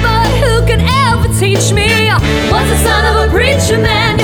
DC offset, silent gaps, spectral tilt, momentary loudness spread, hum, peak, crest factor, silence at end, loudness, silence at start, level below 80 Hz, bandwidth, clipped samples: under 0.1%; none; -4.5 dB/octave; 2 LU; none; 0 dBFS; 10 dB; 0 s; -10 LUFS; 0 s; -18 dBFS; 18 kHz; under 0.1%